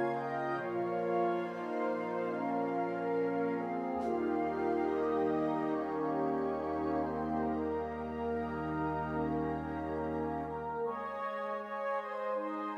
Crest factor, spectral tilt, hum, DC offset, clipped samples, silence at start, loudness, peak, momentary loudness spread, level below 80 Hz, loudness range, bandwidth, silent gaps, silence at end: 14 dB; -8.5 dB/octave; none; under 0.1%; under 0.1%; 0 s; -35 LUFS; -20 dBFS; 5 LU; -58 dBFS; 3 LU; 8.4 kHz; none; 0 s